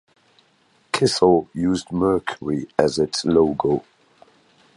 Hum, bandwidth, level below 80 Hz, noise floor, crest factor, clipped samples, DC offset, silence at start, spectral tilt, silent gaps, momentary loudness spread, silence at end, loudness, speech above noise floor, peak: none; 11.5 kHz; -50 dBFS; -60 dBFS; 20 dB; under 0.1%; under 0.1%; 0.95 s; -5 dB/octave; none; 8 LU; 0.95 s; -20 LUFS; 41 dB; 0 dBFS